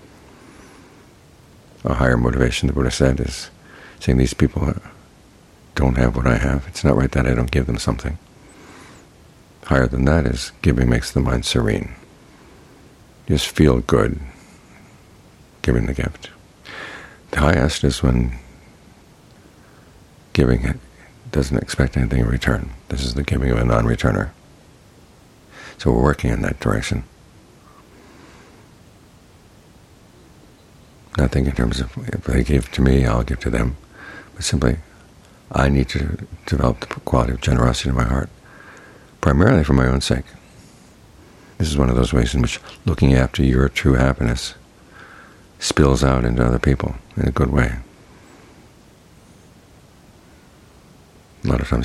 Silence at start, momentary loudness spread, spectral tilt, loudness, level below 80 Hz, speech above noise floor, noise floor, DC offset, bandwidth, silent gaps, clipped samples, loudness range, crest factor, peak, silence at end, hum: 1.85 s; 14 LU; -6 dB/octave; -19 LUFS; -28 dBFS; 31 dB; -48 dBFS; under 0.1%; 13 kHz; none; under 0.1%; 5 LU; 20 dB; 0 dBFS; 0 s; none